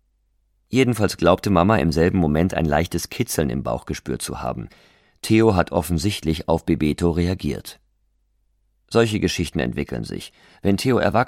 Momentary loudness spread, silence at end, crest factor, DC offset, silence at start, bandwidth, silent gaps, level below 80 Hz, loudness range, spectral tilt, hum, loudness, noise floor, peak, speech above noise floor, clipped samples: 12 LU; 0 s; 20 dB; under 0.1%; 0.7 s; 16.5 kHz; none; -38 dBFS; 5 LU; -6 dB/octave; none; -21 LUFS; -66 dBFS; -2 dBFS; 45 dB; under 0.1%